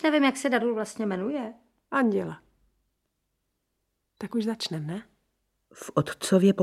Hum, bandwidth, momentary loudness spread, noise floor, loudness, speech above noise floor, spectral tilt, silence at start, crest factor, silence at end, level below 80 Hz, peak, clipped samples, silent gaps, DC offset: none; 14.5 kHz; 16 LU; -79 dBFS; -27 LUFS; 53 dB; -5.5 dB/octave; 0 s; 20 dB; 0 s; -70 dBFS; -8 dBFS; under 0.1%; none; under 0.1%